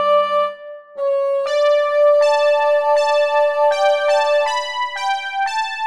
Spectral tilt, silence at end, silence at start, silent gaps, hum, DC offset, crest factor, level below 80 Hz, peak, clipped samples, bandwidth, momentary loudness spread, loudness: 0 dB/octave; 0 s; 0 s; none; none; under 0.1%; 12 dB; -68 dBFS; -6 dBFS; under 0.1%; 10.5 kHz; 7 LU; -17 LUFS